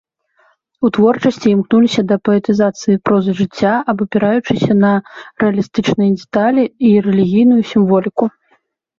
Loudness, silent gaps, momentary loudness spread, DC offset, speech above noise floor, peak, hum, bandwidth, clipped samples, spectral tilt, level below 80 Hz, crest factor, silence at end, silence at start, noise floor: -14 LUFS; none; 5 LU; under 0.1%; 46 dB; -2 dBFS; none; 7.4 kHz; under 0.1%; -7 dB/octave; -52 dBFS; 12 dB; 0.7 s; 0.8 s; -59 dBFS